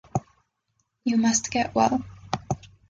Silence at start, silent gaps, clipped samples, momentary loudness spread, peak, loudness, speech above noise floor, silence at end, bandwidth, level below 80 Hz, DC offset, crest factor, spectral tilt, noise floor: 0.15 s; none; under 0.1%; 12 LU; -6 dBFS; -25 LUFS; 52 dB; 0.25 s; 9.2 kHz; -52 dBFS; under 0.1%; 20 dB; -4 dB/octave; -75 dBFS